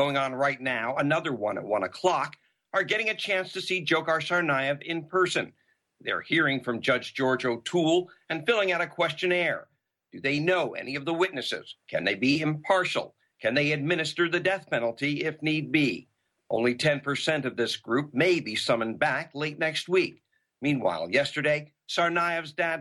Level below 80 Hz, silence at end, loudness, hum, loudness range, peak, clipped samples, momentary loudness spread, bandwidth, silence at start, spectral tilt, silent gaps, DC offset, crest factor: -70 dBFS; 0 s; -27 LUFS; none; 1 LU; -10 dBFS; under 0.1%; 7 LU; 12 kHz; 0 s; -5 dB/octave; none; under 0.1%; 18 dB